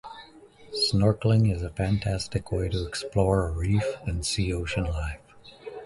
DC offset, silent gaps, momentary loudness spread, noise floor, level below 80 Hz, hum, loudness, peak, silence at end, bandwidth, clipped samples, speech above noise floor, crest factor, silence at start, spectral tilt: under 0.1%; none; 14 LU; -51 dBFS; -38 dBFS; none; -27 LUFS; -8 dBFS; 0 s; 11.5 kHz; under 0.1%; 25 dB; 18 dB; 0.05 s; -5.5 dB/octave